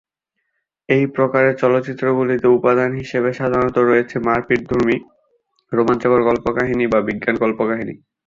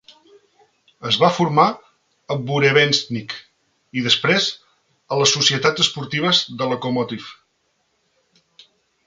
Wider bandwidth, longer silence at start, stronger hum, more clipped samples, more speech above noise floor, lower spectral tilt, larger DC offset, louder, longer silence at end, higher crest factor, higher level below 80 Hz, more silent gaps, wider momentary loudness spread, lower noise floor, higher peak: second, 7.4 kHz vs 9.6 kHz; about the same, 0.9 s vs 1 s; neither; neither; first, 58 dB vs 49 dB; first, -8 dB/octave vs -3.5 dB/octave; neither; about the same, -17 LUFS vs -18 LUFS; second, 0.3 s vs 1.75 s; about the same, 16 dB vs 20 dB; first, -48 dBFS vs -62 dBFS; neither; second, 5 LU vs 18 LU; first, -75 dBFS vs -68 dBFS; about the same, -2 dBFS vs 0 dBFS